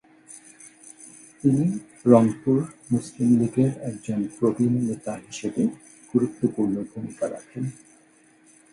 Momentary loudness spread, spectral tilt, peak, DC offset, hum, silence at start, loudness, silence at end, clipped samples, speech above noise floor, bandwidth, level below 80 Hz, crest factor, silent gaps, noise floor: 24 LU; -8 dB/octave; -2 dBFS; under 0.1%; none; 0.3 s; -24 LUFS; 1 s; under 0.1%; 34 dB; 11.5 kHz; -62 dBFS; 22 dB; none; -57 dBFS